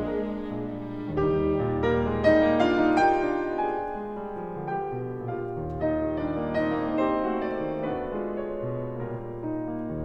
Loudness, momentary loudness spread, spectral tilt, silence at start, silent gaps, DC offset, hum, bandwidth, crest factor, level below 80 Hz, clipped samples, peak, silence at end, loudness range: -27 LUFS; 12 LU; -8 dB/octave; 0 s; none; under 0.1%; none; 8 kHz; 18 dB; -46 dBFS; under 0.1%; -8 dBFS; 0 s; 6 LU